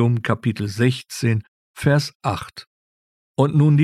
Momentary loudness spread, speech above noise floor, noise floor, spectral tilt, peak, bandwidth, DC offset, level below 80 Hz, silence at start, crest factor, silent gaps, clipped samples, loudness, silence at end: 12 LU; over 71 dB; under -90 dBFS; -7 dB/octave; -2 dBFS; 13.5 kHz; under 0.1%; -54 dBFS; 0 s; 18 dB; 1.48-1.74 s, 2.15-2.20 s, 2.67-3.35 s; under 0.1%; -21 LUFS; 0 s